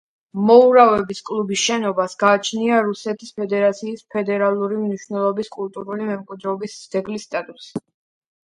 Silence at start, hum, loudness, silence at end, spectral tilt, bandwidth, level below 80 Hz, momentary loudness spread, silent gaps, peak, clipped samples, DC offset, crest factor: 0.35 s; none; -19 LUFS; 0.65 s; -4.5 dB/octave; 10.5 kHz; -62 dBFS; 15 LU; none; 0 dBFS; under 0.1%; under 0.1%; 18 dB